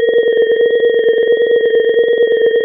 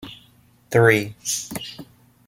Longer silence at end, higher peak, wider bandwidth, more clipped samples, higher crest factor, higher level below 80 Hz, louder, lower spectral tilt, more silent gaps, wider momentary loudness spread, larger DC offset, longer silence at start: second, 0 s vs 0.45 s; about the same, -4 dBFS vs -2 dBFS; second, 3.7 kHz vs 16.5 kHz; neither; second, 8 dB vs 22 dB; about the same, -60 dBFS vs -56 dBFS; first, -12 LUFS vs -20 LUFS; first, -7 dB/octave vs -4 dB/octave; neither; second, 1 LU vs 23 LU; neither; about the same, 0 s vs 0 s